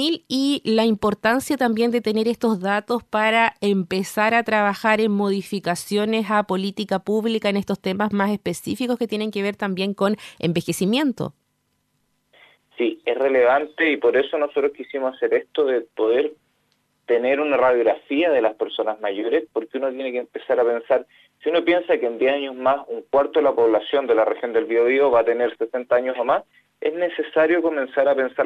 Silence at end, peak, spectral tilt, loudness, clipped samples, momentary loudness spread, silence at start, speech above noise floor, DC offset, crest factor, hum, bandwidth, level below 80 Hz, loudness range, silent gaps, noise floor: 0 s; -4 dBFS; -5.5 dB/octave; -21 LUFS; under 0.1%; 7 LU; 0 s; 50 dB; under 0.1%; 18 dB; none; 14 kHz; -62 dBFS; 4 LU; none; -70 dBFS